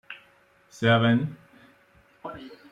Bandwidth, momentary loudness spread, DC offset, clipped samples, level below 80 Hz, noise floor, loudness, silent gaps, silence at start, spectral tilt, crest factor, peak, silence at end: 8 kHz; 23 LU; under 0.1%; under 0.1%; -64 dBFS; -60 dBFS; -23 LUFS; none; 0.1 s; -7 dB/octave; 18 dB; -10 dBFS; 0.15 s